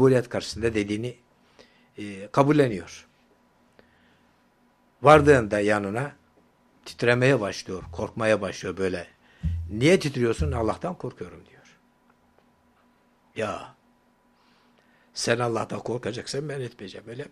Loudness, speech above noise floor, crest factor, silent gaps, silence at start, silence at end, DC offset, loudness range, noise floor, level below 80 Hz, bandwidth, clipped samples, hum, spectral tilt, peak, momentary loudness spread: -24 LUFS; 39 dB; 24 dB; none; 0 s; 0.05 s; under 0.1%; 15 LU; -63 dBFS; -48 dBFS; 13 kHz; under 0.1%; none; -6 dB/octave; -2 dBFS; 19 LU